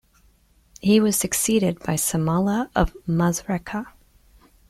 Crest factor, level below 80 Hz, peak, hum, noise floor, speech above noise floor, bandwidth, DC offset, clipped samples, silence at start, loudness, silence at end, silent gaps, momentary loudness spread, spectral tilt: 18 dB; -40 dBFS; -6 dBFS; none; -58 dBFS; 37 dB; 16 kHz; under 0.1%; under 0.1%; 0.85 s; -22 LUFS; 0.8 s; none; 9 LU; -5 dB/octave